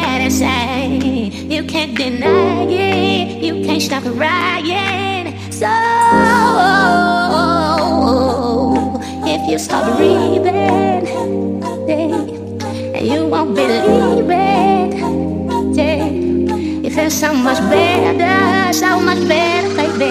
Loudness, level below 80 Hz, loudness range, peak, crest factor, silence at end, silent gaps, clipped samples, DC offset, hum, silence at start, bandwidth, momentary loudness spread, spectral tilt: -14 LUFS; -42 dBFS; 3 LU; 0 dBFS; 14 dB; 0 s; none; under 0.1%; under 0.1%; none; 0 s; 15.5 kHz; 7 LU; -5 dB/octave